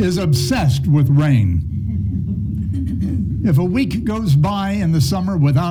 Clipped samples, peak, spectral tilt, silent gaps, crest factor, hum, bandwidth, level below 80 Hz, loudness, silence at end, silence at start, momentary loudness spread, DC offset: under 0.1%; -4 dBFS; -7 dB/octave; none; 12 dB; none; 15.5 kHz; -32 dBFS; -17 LUFS; 0 s; 0 s; 8 LU; under 0.1%